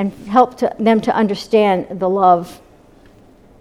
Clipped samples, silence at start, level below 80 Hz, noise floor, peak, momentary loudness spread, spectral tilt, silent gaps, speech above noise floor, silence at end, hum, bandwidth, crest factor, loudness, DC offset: under 0.1%; 0 s; -52 dBFS; -46 dBFS; 0 dBFS; 5 LU; -6.5 dB/octave; none; 31 dB; 1.05 s; none; 14 kHz; 16 dB; -15 LUFS; under 0.1%